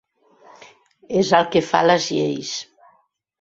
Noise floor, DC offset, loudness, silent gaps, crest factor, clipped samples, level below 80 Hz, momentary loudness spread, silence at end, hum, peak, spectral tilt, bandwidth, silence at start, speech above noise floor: -61 dBFS; under 0.1%; -19 LUFS; none; 20 dB; under 0.1%; -62 dBFS; 11 LU; 0.8 s; none; 0 dBFS; -4.5 dB/octave; 8 kHz; 1.1 s; 43 dB